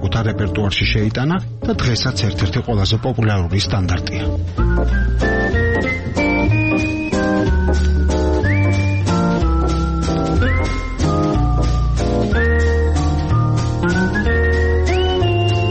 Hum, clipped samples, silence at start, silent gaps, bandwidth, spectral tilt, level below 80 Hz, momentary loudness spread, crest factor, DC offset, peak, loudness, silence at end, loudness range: none; under 0.1%; 0 s; none; 8.6 kHz; -6.5 dB/octave; -22 dBFS; 3 LU; 10 dB; under 0.1%; -6 dBFS; -17 LUFS; 0 s; 2 LU